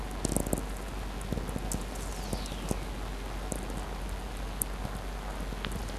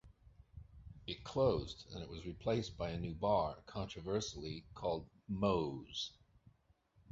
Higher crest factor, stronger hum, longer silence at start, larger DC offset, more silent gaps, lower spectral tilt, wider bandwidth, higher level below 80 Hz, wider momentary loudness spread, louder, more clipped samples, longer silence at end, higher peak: first, 28 dB vs 20 dB; neither; about the same, 0 s vs 0.05 s; neither; neither; about the same, -4.5 dB/octave vs -5.5 dB/octave; first, 14.5 kHz vs 7.6 kHz; first, -38 dBFS vs -58 dBFS; second, 6 LU vs 14 LU; first, -36 LUFS vs -40 LUFS; neither; second, 0 s vs 0.6 s; first, -6 dBFS vs -20 dBFS